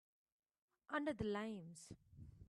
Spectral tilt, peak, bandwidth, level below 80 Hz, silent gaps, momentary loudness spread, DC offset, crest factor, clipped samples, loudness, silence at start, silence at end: -5.5 dB/octave; -30 dBFS; 12.5 kHz; -72 dBFS; none; 18 LU; under 0.1%; 18 dB; under 0.1%; -45 LUFS; 0.9 s; 0.05 s